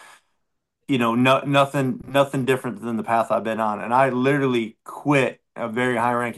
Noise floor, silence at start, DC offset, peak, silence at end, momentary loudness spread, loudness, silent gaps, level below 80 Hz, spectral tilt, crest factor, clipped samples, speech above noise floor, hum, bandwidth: -77 dBFS; 0.9 s; under 0.1%; -4 dBFS; 0 s; 9 LU; -21 LUFS; none; -64 dBFS; -6 dB/octave; 18 dB; under 0.1%; 56 dB; none; 12.5 kHz